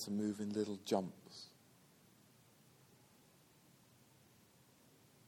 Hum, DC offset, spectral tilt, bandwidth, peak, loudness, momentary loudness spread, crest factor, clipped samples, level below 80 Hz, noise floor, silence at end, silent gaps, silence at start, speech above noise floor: none; under 0.1%; -5.5 dB/octave; 18 kHz; -22 dBFS; -42 LUFS; 27 LU; 26 dB; under 0.1%; -86 dBFS; -68 dBFS; 3.8 s; none; 0 s; 27 dB